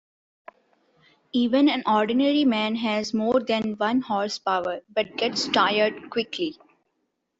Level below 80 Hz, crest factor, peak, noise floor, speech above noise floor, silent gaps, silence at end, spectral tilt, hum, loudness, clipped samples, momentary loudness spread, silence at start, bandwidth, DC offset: -66 dBFS; 18 dB; -6 dBFS; -76 dBFS; 53 dB; none; 0.9 s; -4.5 dB/octave; none; -24 LUFS; under 0.1%; 8 LU; 1.35 s; 8 kHz; under 0.1%